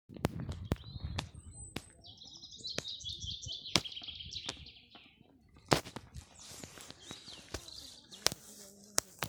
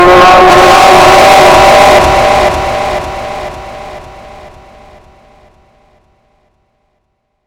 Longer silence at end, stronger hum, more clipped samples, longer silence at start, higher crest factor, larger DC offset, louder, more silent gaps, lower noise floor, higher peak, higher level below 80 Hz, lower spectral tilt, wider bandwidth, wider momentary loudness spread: second, 0 s vs 3.4 s; neither; second, under 0.1% vs 9%; about the same, 0.1 s vs 0 s; first, 40 dB vs 8 dB; neither; second, -39 LUFS vs -4 LUFS; neither; about the same, -63 dBFS vs -63 dBFS; about the same, -2 dBFS vs 0 dBFS; second, -56 dBFS vs -28 dBFS; about the same, -3 dB/octave vs -3.5 dB/octave; about the same, over 20 kHz vs over 20 kHz; second, 18 LU vs 21 LU